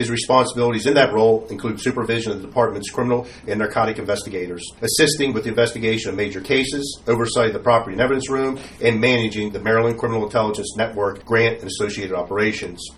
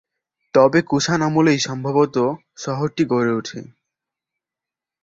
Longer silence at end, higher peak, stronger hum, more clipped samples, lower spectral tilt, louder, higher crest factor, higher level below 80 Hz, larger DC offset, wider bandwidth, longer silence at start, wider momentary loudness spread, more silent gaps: second, 0.05 s vs 1.4 s; about the same, 0 dBFS vs -2 dBFS; neither; neither; about the same, -4.5 dB/octave vs -5.5 dB/octave; about the same, -20 LUFS vs -19 LUFS; about the same, 20 dB vs 18 dB; first, -48 dBFS vs -58 dBFS; neither; first, 13.5 kHz vs 7.8 kHz; second, 0 s vs 0.55 s; second, 8 LU vs 12 LU; neither